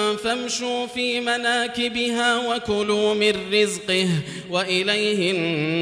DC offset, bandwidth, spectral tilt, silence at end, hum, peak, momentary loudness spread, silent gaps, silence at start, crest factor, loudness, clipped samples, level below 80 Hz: under 0.1%; 15.5 kHz; -3.5 dB/octave; 0 s; none; -4 dBFS; 5 LU; none; 0 s; 18 dB; -21 LUFS; under 0.1%; -58 dBFS